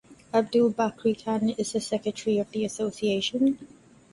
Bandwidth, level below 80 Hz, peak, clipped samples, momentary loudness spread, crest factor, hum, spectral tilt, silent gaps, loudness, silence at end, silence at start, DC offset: 11.5 kHz; -64 dBFS; -10 dBFS; under 0.1%; 6 LU; 16 dB; none; -5 dB/octave; none; -27 LUFS; 0.45 s; 0.1 s; under 0.1%